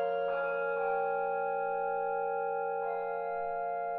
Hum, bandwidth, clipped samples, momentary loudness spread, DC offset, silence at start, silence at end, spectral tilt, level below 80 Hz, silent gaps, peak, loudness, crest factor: none; 4.4 kHz; under 0.1%; 3 LU; under 0.1%; 0 s; 0 s; -3 dB/octave; -70 dBFS; none; -22 dBFS; -33 LUFS; 12 dB